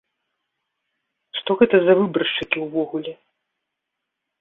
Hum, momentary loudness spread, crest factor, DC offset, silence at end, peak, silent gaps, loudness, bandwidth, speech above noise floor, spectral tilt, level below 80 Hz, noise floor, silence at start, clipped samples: none; 14 LU; 22 dB; under 0.1%; 1.25 s; -2 dBFS; none; -20 LUFS; 4.1 kHz; 62 dB; -8 dB/octave; -62 dBFS; -81 dBFS; 1.35 s; under 0.1%